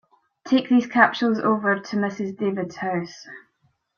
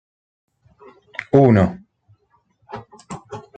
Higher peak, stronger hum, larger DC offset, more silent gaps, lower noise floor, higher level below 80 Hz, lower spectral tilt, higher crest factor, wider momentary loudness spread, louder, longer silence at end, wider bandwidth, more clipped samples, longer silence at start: about the same, -2 dBFS vs 0 dBFS; neither; neither; neither; first, -68 dBFS vs -62 dBFS; second, -68 dBFS vs -54 dBFS; second, -6 dB/octave vs -9 dB/octave; about the same, 22 dB vs 22 dB; second, 11 LU vs 24 LU; second, -22 LUFS vs -16 LUFS; first, 0.6 s vs 0.15 s; second, 7 kHz vs 9 kHz; neither; second, 0.45 s vs 1.2 s